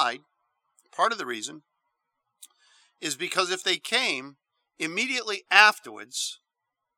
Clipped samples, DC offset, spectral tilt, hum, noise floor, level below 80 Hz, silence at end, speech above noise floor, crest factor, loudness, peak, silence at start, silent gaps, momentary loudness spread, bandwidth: under 0.1%; under 0.1%; -0.5 dB/octave; none; -84 dBFS; -86 dBFS; 0.6 s; 58 dB; 28 dB; -25 LUFS; 0 dBFS; 0 s; none; 18 LU; 19 kHz